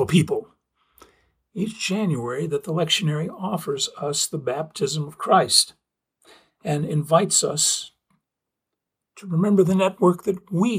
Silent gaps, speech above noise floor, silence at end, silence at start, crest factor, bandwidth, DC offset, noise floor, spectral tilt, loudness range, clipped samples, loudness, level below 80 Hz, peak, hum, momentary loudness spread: none; 62 dB; 0 s; 0 s; 22 dB; 16.5 kHz; under 0.1%; -84 dBFS; -4 dB/octave; 4 LU; under 0.1%; -22 LUFS; -62 dBFS; -2 dBFS; none; 10 LU